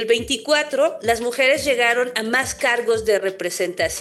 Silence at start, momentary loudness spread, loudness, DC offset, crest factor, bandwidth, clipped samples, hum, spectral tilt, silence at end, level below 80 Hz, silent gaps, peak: 0 s; 5 LU; -19 LUFS; under 0.1%; 14 dB; 13 kHz; under 0.1%; none; -2 dB/octave; 0 s; -50 dBFS; none; -6 dBFS